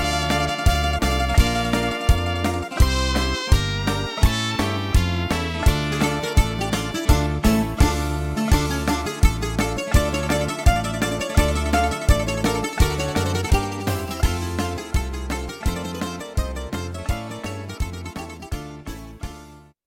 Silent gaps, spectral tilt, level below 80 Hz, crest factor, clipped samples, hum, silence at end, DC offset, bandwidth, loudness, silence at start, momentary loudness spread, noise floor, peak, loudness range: none; -5 dB/octave; -24 dBFS; 20 dB; under 0.1%; none; 0.25 s; under 0.1%; 17 kHz; -22 LUFS; 0 s; 10 LU; -44 dBFS; -2 dBFS; 8 LU